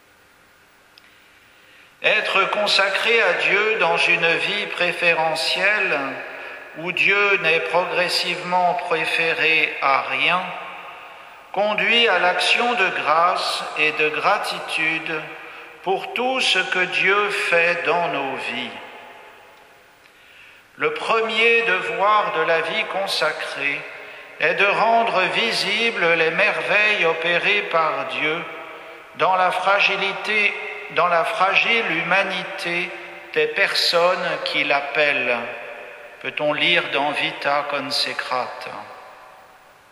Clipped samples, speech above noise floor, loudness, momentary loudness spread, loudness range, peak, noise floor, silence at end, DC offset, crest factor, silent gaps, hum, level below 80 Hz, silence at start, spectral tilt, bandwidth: under 0.1%; 33 dB; -19 LUFS; 14 LU; 4 LU; -2 dBFS; -53 dBFS; 0.6 s; under 0.1%; 20 dB; none; none; -72 dBFS; 2 s; -2.5 dB/octave; 15 kHz